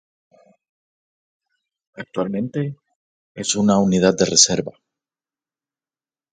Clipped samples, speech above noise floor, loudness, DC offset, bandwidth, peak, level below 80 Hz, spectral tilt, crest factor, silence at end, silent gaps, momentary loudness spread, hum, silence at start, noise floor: under 0.1%; over 71 dB; -18 LUFS; under 0.1%; 9.6 kHz; 0 dBFS; -56 dBFS; -3.5 dB/octave; 22 dB; 1.6 s; 2.95-3.35 s; 16 LU; none; 2 s; under -90 dBFS